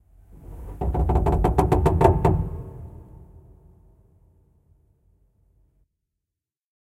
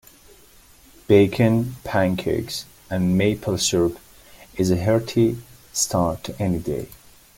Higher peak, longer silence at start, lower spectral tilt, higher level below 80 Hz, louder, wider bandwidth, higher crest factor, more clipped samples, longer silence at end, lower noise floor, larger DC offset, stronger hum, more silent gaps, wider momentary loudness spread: about the same, -2 dBFS vs -2 dBFS; second, 0.35 s vs 1.1 s; first, -9 dB/octave vs -5.5 dB/octave; first, -30 dBFS vs -48 dBFS; about the same, -22 LUFS vs -21 LUFS; second, 14 kHz vs 17 kHz; about the same, 22 dB vs 20 dB; neither; first, 3.65 s vs 0.45 s; first, -87 dBFS vs -50 dBFS; neither; neither; neither; first, 24 LU vs 13 LU